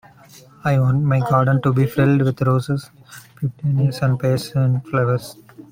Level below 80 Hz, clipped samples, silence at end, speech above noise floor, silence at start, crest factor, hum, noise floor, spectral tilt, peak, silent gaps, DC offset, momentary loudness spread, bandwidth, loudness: -52 dBFS; under 0.1%; 0.1 s; 28 dB; 0.65 s; 14 dB; none; -46 dBFS; -8 dB/octave; -4 dBFS; none; under 0.1%; 10 LU; 16 kHz; -19 LUFS